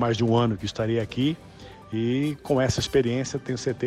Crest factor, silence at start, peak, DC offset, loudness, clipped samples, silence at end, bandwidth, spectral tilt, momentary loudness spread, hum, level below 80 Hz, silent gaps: 14 dB; 0 s; -10 dBFS; under 0.1%; -25 LUFS; under 0.1%; 0 s; 13.5 kHz; -6 dB/octave; 10 LU; none; -50 dBFS; none